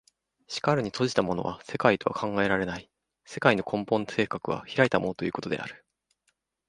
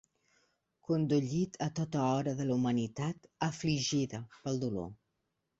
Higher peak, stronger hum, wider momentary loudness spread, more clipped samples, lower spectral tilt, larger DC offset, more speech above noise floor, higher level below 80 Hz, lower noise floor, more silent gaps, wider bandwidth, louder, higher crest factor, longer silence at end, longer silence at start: first, -4 dBFS vs -18 dBFS; neither; about the same, 10 LU vs 8 LU; neither; about the same, -5.5 dB/octave vs -6 dB/octave; neither; about the same, 48 dB vs 50 dB; first, -60 dBFS vs -66 dBFS; second, -75 dBFS vs -83 dBFS; neither; first, 11.5 kHz vs 8 kHz; first, -27 LUFS vs -34 LUFS; first, 24 dB vs 16 dB; first, 0.95 s vs 0.65 s; second, 0.5 s vs 0.9 s